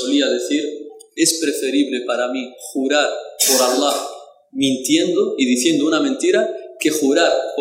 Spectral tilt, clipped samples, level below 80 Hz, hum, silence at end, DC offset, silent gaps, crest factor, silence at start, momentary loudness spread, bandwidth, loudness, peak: -2 dB/octave; under 0.1%; -66 dBFS; none; 0 s; under 0.1%; none; 16 dB; 0 s; 10 LU; 16 kHz; -18 LUFS; -2 dBFS